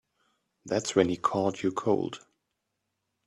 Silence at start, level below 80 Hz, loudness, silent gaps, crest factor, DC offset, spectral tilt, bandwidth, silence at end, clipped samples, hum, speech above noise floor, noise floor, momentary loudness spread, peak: 0.65 s; -68 dBFS; -28 LUFS; none; 22 dB; under 0.1%; -5 dB/octave; 11.5 kHz; 1.1 s; under 0.1%; none; 54 dB; -82 dBFS; 8 LU; -8 dBFS